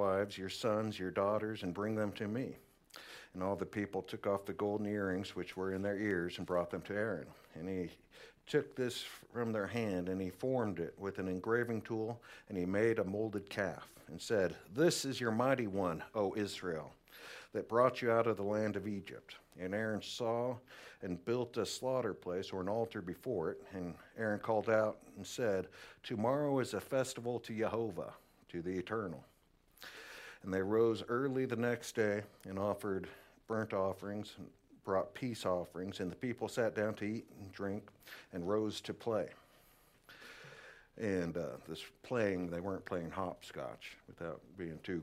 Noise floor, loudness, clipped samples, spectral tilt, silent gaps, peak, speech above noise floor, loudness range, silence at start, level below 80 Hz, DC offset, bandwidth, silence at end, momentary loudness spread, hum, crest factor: -69 dBFS; -38 LUFS; under 0.1%; -5.5 dB/octave; none; -16 dBFS; 31 dB; 5 LU; 0 s; -74 dBFS; under 0.1%; 16 kHz; 0 s; 16 LU; none; 22 dB